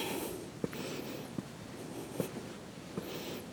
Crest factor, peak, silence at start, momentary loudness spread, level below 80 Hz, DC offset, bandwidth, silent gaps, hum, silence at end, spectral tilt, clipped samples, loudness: 22 dB; -20 dBFS; 0 s; 7 LU; -66 dBFS; under 0.1%; over 20 kHz; none; none; 0 s; -4.5 dB/octave; under 0.1%; -42 LUFS